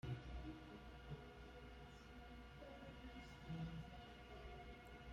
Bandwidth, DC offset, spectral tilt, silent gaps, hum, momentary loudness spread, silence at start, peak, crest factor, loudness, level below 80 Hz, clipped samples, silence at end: 16 kHz; under 0.1%; -6.5 dB/octave; none; none; 8 LU; 0.05 s; -38 dBFS; 18 dB; -57 LUFS; -60 dBFS; under 0.1%; 0 s